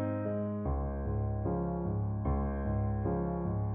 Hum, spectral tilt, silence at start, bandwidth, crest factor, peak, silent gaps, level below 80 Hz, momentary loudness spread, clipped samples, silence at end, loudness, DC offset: none; -12 dB/octave; 0 s; 2.7 kHz; 12 dB; -20 dBFS; none; -40 dBFS; 2 LU; under 0.1%; 0 s; -34 LUFS; under 0.1%